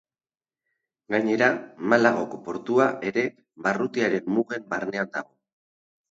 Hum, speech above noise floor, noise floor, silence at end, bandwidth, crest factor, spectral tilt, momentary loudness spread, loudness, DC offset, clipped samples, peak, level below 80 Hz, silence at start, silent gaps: none; 60 dB; -84 dBFS; 0.85 s; 7.8 kHz; 22 dB; -6 dB/octave; 10 LU; -25 LUFS; under 0.1%; under 0.1%; -4 dBFS; -72 dBFS; 1.1 s; none